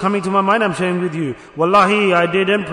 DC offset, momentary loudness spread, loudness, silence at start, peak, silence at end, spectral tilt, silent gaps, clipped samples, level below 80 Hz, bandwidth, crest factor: under 0.1%; 9 LU; -16 LUFS; 0 s; -2 dBFS; 0 s; -6 dB/octave; none; under 0.1%; -56 dBFS; 11 kHz; 14 dB